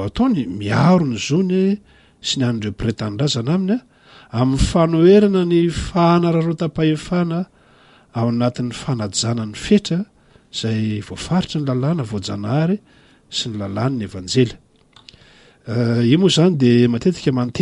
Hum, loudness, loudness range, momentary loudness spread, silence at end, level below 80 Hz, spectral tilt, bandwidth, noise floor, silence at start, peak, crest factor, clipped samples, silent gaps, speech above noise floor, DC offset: none; -18 LUFS; 6 LU; 11 LU; 0 s; -38 dBFS; -6 dB/octave; 11.5 kHz; -50 dBFS; 0 s; -2 dBFS; 16 dB; under 0.1%; none; 33 dB; under 0.1%